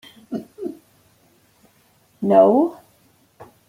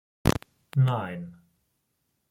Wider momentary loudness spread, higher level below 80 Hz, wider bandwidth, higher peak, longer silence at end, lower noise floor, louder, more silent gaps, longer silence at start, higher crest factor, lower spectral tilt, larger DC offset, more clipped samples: first, 20 LU vs 14 LU; second, -68 dBFS vs -46 dBFS; about the same, 15.5 kHz vs 16 kHz; first, -2 dBFS vs -6 dBFS; second, 0.25 s vs 1 s; second, -58 dBFS vs -76 dBFS; first, -17 LUFS vs -28 LUFS; neither; about the same, 0.3 s vs 0.25 s; about the same, 20 dB vs 24 dB; first, -8.5 dB/octave vs -6.5 dB/octave; neither; neither